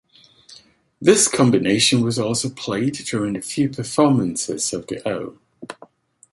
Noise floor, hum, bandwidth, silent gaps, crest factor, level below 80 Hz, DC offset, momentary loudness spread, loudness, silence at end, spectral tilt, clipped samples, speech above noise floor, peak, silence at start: -50 dBFS; none; 12 kHz; none; 18 dB; -56 dBFS; under 0.1%; 12 LU; -19 LUFS; 0.6 s; -4 dB/octave; under 0.1%; 30 dB; -2 dBFS; 0.5 s